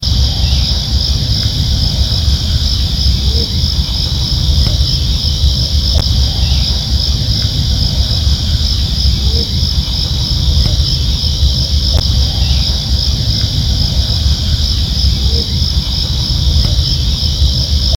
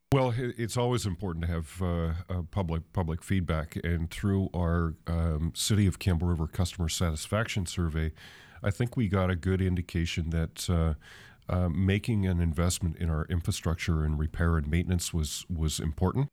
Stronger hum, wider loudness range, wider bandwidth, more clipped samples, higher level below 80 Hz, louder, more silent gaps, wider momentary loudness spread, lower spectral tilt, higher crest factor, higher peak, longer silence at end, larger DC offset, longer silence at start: neither; about the same, 1 LU vs 2 LU; first, 17 kHz vs 15 kHz; neither; first, -14 dBFS vs -38 dBFS; first, -13 LUFS vs -30 LUFS; neither; second, 2 LU vs 6 LU; about the same, -4.5 dB/octave vs -5.5 dB/octave; second, 12 dB vs 18 dB; first, 0 dBFS vs -12 dBFS; about the same, 0 s vs 0.05 s; neither; about the same, 0 s vs 0.1 s